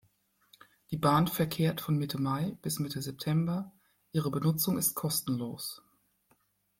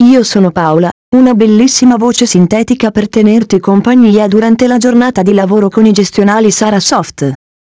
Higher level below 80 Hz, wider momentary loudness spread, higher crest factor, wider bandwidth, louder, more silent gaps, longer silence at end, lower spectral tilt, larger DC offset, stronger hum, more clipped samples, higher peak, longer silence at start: second, -64 dBFS vs -44 dBFS; first, 10 LU vs 5 LU; first, 18 dB vs 8 dB; first, 16.5 kHz vs 8 kHz; second, -31 LUFS vs -8 LUFS; second, none vs 0.92-1.12 s; first, 1 s vs 0.4 s; about the same, -5 dB/octave vs -5 dB/octave; neither; neither; second, under 0.1% vs 2%; second, -14 dBFS vs 0 dBFS; first, 0.9 s vs 0 s